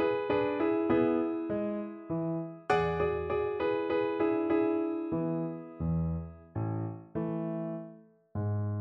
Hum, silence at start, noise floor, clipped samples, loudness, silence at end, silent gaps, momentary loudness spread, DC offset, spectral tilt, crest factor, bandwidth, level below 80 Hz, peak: none; 0 s; -53 dBFS; under 0.1%; -32 LUFS; 0 s; none; 10 LU; under 0.1%; -9 dB/octave; 18 dB; 7.4 kHz; -54 dBFS; -14 dBFS